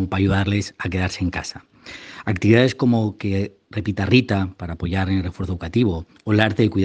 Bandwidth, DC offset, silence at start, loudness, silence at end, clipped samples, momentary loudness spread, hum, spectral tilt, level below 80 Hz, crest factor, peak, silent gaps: 9 kHz; under 0.1%; 0 s; -21 LUFS; 0 s; under 0.1%; 12 LU; none; -6.5 dB/octave; -46 dBFS; 20 dB; 0 dBFS; none